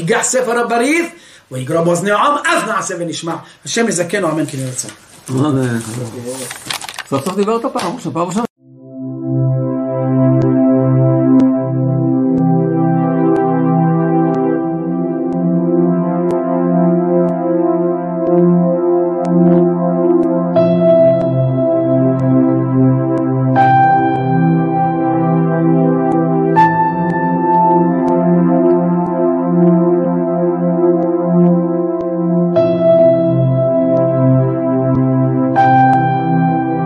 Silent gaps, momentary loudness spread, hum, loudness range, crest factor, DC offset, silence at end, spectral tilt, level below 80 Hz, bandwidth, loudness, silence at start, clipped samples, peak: 8.50-8.56 s; 9 LU; none; 6 LU; 12 dB; under 0.1%; 0 s; -7 dB/octave; -52 dBFS; 13 kHz; -13 LUFS; 0 s; under 0.1%; 0 dBFS